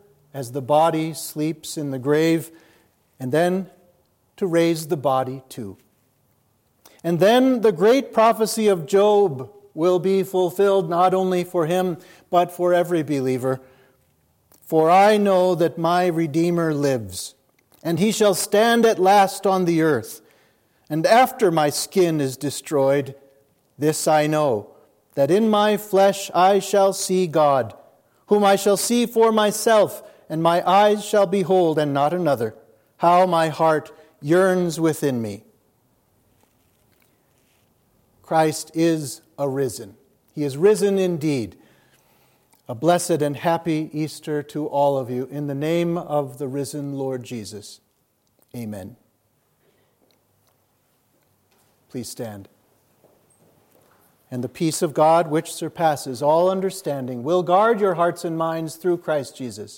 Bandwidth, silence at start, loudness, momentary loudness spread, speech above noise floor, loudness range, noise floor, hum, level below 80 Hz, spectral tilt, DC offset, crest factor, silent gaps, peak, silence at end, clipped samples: 17 kHz; 0.35 s; -20 LUFS; 16 LU; 47 dB; 11 LU; -67 dBFS; none; -70 dBFS; -5 dB/octave; under 0.1%; 18 dB; none; -4 dBFS; 0 s; under 0.1%